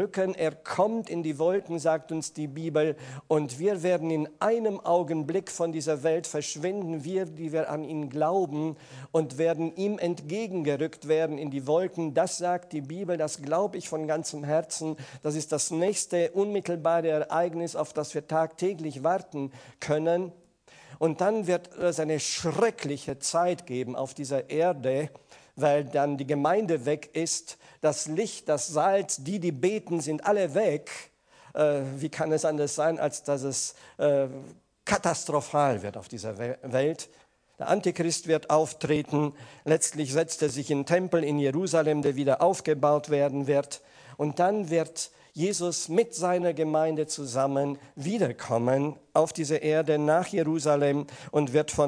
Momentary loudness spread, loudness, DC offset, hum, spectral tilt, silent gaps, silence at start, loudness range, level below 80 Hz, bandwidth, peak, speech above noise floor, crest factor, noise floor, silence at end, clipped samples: 8 LU; -28 LUFS; under 0.1%; none; -5 dB/octave; none; 0 s; 3 LU; -68 dBFS; 10.5 kHz; -6 dBFS; 27 dB; 22 dB; -55 dBFS; 0 s; under 0.1%